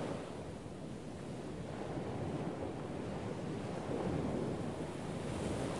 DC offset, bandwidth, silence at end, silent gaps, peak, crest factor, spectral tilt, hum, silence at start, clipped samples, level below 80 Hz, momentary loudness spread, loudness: 0.1%; 11.5 kHz; 0 s; none; -26 dBFS; 16 dB; -6.5 dB/octave; none; 0 s; under 0.1%; -58 dBFS; 8 LU; -42 LUFS